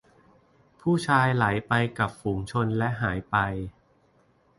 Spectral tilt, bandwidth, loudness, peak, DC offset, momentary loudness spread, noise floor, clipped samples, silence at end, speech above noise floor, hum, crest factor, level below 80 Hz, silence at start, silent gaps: -6.5 dB/octave; 11.5 kHz; -26 LUFS; -6 dBFS; under 0.1%; 9 LU; -63 dBFS; under 0.1%; 0.9 s; 38 dB; none; 20 dB; -50 dBFS; 0.85 s; none